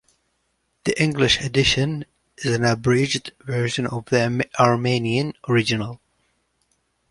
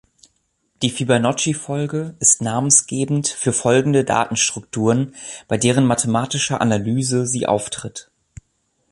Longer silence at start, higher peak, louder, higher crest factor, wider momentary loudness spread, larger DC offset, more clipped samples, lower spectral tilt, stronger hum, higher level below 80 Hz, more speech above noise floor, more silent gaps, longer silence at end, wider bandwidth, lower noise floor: about the same, 0.85 s vs 0.8 s; about the same, -2 dBFS vs 0 dBFS; second, -21 LUFS vs -18 LUFS; about the same, 20 dB vs 18 dB; about the same, 10 LU vs 10 LU; neither; neither; about the same, -5 dB/octave vs -4 dB/octave; neither; first, -48 dBFS vs -54 dBFS; about the same, 50 dB vs 49 dB; neither; first, 1.15 s vs 0.9 s; about the same, 11.5 kHz vs 11.5 kHz; about the same, -70 dBFS vs -67 dBFS